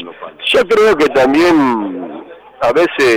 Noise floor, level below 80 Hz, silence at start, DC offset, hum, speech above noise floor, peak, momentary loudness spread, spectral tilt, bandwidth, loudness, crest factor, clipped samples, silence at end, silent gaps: -32 dBFS; -46 dBFS; 0 s; under 0.1%; none; 22 dB; -6 dBFS; 17 LU; -4.5 dB/octave; 16.5 kHz; -12 LUFS; 6 dB; under 0.1%; 0 s; none